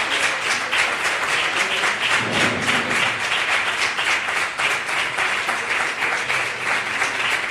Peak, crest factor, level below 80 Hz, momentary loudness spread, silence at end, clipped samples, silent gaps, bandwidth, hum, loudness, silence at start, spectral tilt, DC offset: -4 dBFS; 16 dB; -58 dBFS; 3 LU; 0 s; under 0.1%; none; 15 kHz; none; -19 LUFS; 0 s; -1.5 dB/octave; under 0.1%